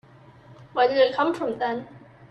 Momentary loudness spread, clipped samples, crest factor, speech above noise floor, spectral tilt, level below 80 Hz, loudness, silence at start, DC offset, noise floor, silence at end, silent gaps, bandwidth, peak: 11 LU; under 0.1%; 18 dB; 27 dB; -5.5 dB/octave; -66 dBFS; -24 LUFS; 0.5 s; under 0.1%; -50 dBFS; 0.05 s; none; 9 kHz; -8 dBFS